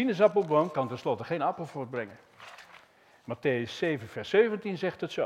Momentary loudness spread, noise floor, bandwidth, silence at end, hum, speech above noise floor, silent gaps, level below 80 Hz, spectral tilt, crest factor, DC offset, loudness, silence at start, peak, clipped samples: 21 LU; -58 dBFS; 11.5 kHz; 0 s; none; 29 dB; none; -72 dBFS; -6.5 dB/octave; 20 dB; under 0.1%; -29 LUFS; 0 s; -10 dBFS; under 0.1%